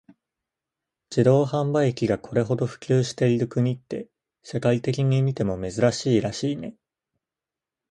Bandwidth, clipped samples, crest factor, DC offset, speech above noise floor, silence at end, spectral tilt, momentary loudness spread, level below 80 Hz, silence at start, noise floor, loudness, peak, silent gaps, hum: 9.6 kHz; under 0.1%; 20 dB; under 0.1%; 66 dB; 1.2 s; -7 dB/octave; 10 LU; -56 dBFS; 1.1 s; -89 dBFS; -24 LUFS; -6 dBFS; none; none